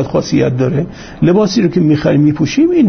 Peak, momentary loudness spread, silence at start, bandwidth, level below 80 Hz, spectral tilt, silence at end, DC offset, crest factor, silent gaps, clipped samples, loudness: -2 dBFS; 5 LU; 0 s; 6.6 kHz; -40 dBFS; -7 dB/octave; 0 s; under 0.1%; 10 dB; none; under 0.1%; -12 LUFS